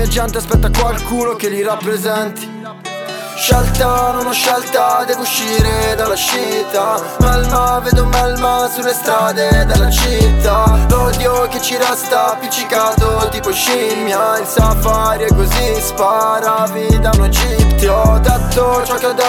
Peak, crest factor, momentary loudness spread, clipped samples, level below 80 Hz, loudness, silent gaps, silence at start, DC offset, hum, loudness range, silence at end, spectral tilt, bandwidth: 0 dBFS; 12 dB; 5 LU; under 0.1%; -18 dBFS; -14 LUFS; none; 0 s; under 0.1%; none; 3 LU; 0 s; -4.5 dB/octave; 18.5 kHz